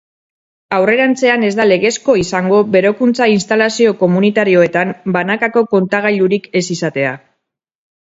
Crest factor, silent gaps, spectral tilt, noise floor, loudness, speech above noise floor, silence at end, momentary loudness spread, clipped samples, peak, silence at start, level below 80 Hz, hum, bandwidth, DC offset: 14 dB; none; -5.5 dB/octave; -72 dBFS; -13 LUFS; 59 dB; 1 s; 6 LU; under 0.1%; 0 dBFS; 0.7 s; -54 dBFS; none; 8 kHz; under 0.1%